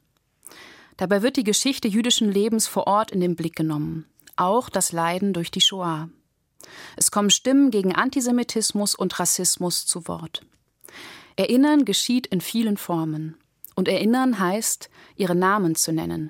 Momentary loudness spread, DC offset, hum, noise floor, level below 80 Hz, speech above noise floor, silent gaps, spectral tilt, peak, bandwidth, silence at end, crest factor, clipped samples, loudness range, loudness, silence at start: 14 LU; under 0.1%; none; -52 dBFS; -64 dBFS; 30 dB; none; -3.5 dB/octave; -4 dBFS; 17 kHz; 0 s; 18 dB; under 0.1%; 3 LU; -21 LUFS; 0.55 s